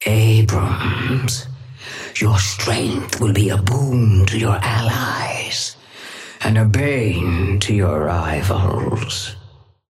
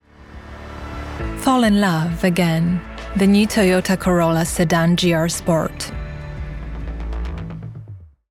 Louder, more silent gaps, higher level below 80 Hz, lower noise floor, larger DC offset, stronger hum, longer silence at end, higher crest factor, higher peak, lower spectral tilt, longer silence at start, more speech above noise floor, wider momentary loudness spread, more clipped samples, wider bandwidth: about the same, -18 LUFS vs -18 LUFS; neither; about the same, -38 dBFS vs -34 dBFS; first, -45 dBFS vs -39 dBFS; neither; neither; first, 0.4 s vs 0.25 s; about the same, 14 dB vs 16 dB; about the same, -4 dBFS vs -4 dBFS; about the same, -5 dB/octave vs -5.5 dB/octave; second, 0 s vs 0.2 s; first, 28 dB vs 23 dB; second, 11 LU vs 17 LU; neither; about the same, 15 kHz vs 16 kHz